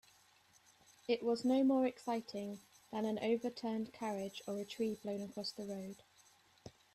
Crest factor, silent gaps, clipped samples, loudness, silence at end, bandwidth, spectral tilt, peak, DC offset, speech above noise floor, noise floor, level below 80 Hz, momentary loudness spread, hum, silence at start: 18 dB; none; under 0.1%; -39 LUFS; 0.25 s; 13.5 kHz; -5.5 dB/octave; -22 dBFS; under 0.1%; 31 dB; -69 dBFS; -80 dBFS; 18 LU; none; 1.1 s